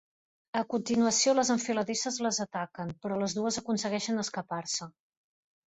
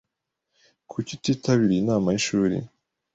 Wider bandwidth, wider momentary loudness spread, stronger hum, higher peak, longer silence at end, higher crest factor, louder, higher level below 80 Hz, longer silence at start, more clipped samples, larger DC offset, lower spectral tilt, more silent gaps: about the same, 8.4 kHz vs 8.2 kHz; about the same, 11 LU vs 12 LU; neither; second, -14 dBFS vs -8 dBFS; first, 0.75 s vs 0.5 s; about the same, 16 dB vs 18 dB; second, -30 LUFS vs -24 LUFS; second, -70 dBFS vs -56 dBFS; second, 0.55 s vs 0.9 s; neither; neither; second, -3 dB/octave vs -5.5 dB/octave; neither